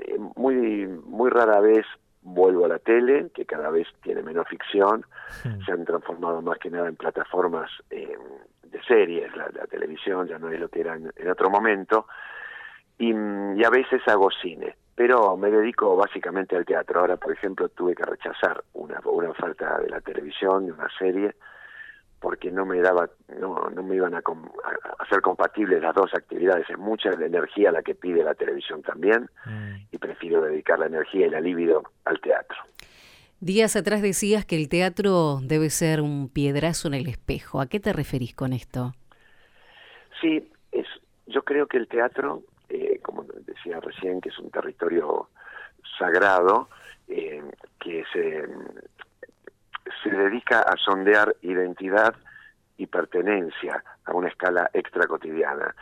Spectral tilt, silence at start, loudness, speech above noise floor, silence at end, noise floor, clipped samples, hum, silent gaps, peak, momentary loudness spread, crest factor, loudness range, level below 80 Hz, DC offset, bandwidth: -5 dB/octave; 0 s; -24 LUFS; 31 dB; 0 s; -55 dBFS; under 0.1%; none; none; -6 dBFS; 16 LU; 18 dB; 7 LU; -54 dBFS; under 0.1%; 16 kHz